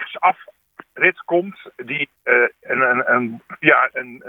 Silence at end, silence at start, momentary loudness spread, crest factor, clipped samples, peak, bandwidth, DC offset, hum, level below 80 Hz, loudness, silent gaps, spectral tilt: 0 s; 0 s; 13 LU; 20 dB; under 0.1%; 0 dBFS; 3.9 kHz; under 0.1%; none; -74 dBFS; -18 LUFS; none; -7.5 dB/octave